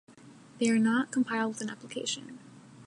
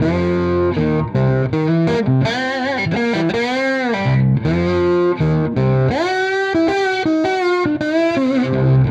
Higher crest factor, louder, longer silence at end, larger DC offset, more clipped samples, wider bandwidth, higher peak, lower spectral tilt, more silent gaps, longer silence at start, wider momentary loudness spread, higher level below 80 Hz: about the same, 16 dB vs 12 dB; second, -30 LUFS vs -17 LUFS; about the same, 0 s vs 0 s; neither; neither; first, 11 kHz vs 8.2 kHz; second, -16 dBFS vs -4 dBFS; second, -4 dB/octave vs -7.5 dB/octave; neither; about the same, 0.1 s vs 0 s; first, 12 LU vs 2 LU; second, -80 dBFS vs -40 dBFS